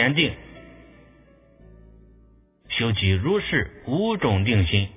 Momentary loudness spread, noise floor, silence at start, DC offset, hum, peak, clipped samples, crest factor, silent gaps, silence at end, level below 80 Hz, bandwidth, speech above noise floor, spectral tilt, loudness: 8 LU; -55 dBFS; 0 s; under 0.1%; none; -4 dBFS; under 0.1%; 20 dB; none; 0 s; -38 dBFS; 3.8 kHz; 33 dB; -10 dB/octave; -22 LUFS